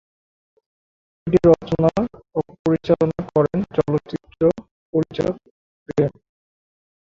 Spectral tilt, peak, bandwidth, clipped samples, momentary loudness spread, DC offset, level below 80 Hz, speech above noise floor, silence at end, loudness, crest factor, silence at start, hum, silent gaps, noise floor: -9 dB/octave; -2 dBFS; 7.6 kHz; under 0.1%; 11 LU; under 0.1%; -48 dBFS; over 71 dB; 0.9 s; -21 LUFS; 20 dB; 1.25 s; none; 2.59-2.65 s, 4.71-4.93 s, 5.51-5.86 s; under -90 dBFS